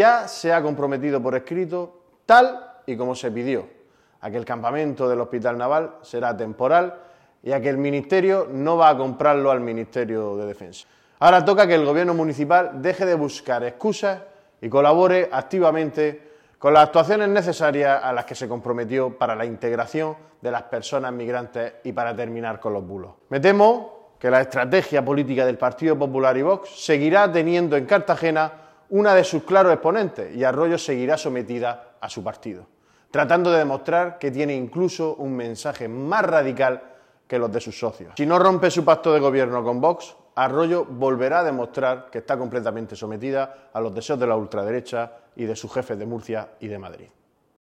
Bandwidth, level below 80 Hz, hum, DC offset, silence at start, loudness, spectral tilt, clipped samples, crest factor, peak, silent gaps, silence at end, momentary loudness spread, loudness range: 13 kHz; -66 dBFS; none; under 0.1%; 0 s; -21 LUFS; -6 dB/octave; under 0.1%; 18 dB; -2 dBFS; none; 0.65 s; 14 LU; 7 LU